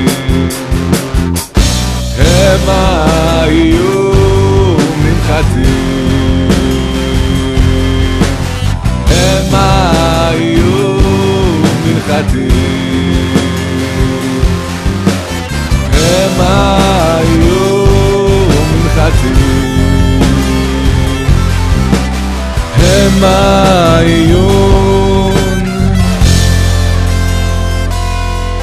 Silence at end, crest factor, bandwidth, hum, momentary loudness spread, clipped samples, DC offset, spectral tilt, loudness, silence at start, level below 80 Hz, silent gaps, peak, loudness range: 0 s; 8 dB; 14.5 kHz; none; 6 LU; 0.4%; 0.4%; -5.5 dB/octave; -10 LUFS; 0 s; -16 dBFS; none; 0 dBFS; 3 LU